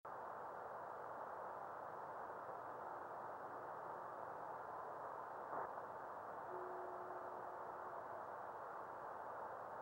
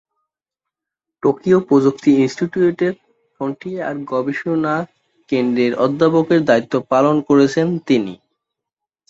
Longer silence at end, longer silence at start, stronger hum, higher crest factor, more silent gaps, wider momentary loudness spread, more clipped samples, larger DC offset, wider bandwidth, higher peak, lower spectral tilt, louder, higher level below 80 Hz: second, 0 s vs 0.95 s; second, 0.05 s vs 1.25 s; neither; about the same, 16 dB vs 16 dB; neither; second, 2 LU vs 11 LU; neither; neither; first, 16 kHz vs 7.8 kHz; second, -34 dBFS vs -2 dBFS; about the same, -6 dB/octave vs -7 dB/octave; second, -51 LUFS vs -17 LUFS; second, -88 dBFS vs -60 dBFS